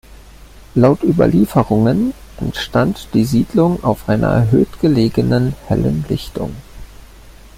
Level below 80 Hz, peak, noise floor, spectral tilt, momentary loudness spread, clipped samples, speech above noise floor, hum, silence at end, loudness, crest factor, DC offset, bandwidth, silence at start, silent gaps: -36 dBFS; -2 dBFS; -39 dBFS; -8 dB/octave; 10 LU; under 0.1%; 25 dB; none; 0.25 s; -15 LUFS; 14 dB; under 0.1%; 16 kHz; 0.75 s; none